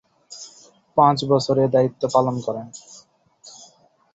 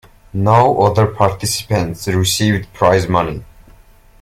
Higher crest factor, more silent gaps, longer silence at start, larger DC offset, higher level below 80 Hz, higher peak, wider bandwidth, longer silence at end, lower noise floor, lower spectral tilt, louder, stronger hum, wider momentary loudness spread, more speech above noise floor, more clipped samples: first, 20 dB vs 14 dB; neither; about the same, 0.3 s vs 0.35 s; neither; second, -60 dBFS vs -40 dBFS; about the same, -2 dBFS vs 0 dBFS; second, 8.2 kHz vs 16 kHz; about the same, 0.65 s vs 0.75 s; first, -55 dBFS vs -45 dBFS; first, -6.5 dB/octave vs -5 dB/octave; second, -20 LUFS vs -15 LUFS; neither; first, 24 LU vs 8 LU; first, 36 dB vs 31 dB; neither